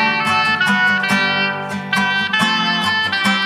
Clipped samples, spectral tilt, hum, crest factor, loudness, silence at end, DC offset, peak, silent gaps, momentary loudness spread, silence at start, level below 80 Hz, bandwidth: under 0.1%; -3.5 dB/octave; none; 16 dB; -15 LUFS; 0 s; under 0.1%; -2 dBFS; none; 4 LU; 0 s; -66 dBFS; 15.5 kHz